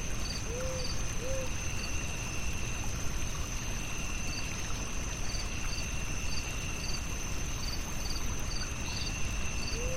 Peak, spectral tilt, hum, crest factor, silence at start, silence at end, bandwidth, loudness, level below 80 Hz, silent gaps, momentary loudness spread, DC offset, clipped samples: -20 dBFS; -3 dB/octave; none; 14 dB; 0 s; 0 s; 16 kHz; -36 LUFS; -38 dBFS; none; 2 LU; under 0.1%; under 0.1%